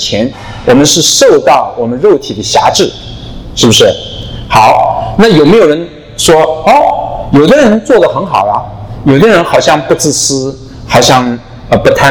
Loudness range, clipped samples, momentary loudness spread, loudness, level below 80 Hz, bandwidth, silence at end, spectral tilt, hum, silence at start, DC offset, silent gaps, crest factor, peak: 2 LU; 5%; 12 LU; -7 LUFS; -30 dBFS; 19.5 kHz; 0 s; -4 dB/octave; none; 0 s; under 0.1%; none; 8 dB; 0 dBFS